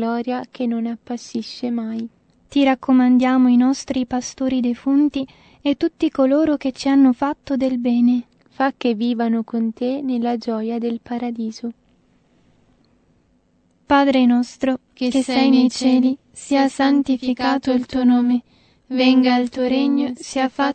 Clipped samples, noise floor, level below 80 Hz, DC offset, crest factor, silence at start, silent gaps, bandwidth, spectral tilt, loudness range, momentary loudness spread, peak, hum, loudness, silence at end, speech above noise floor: under 0.1%; -61 dBFS; -56 dBFS; under 0.1%; 16 dB; 0 s; none; 8.8 kHz; -4.5 dB/octave; 7 LU; 11 LU; -4 dBFS; none; -19 LUFS; 0 s; 42 dB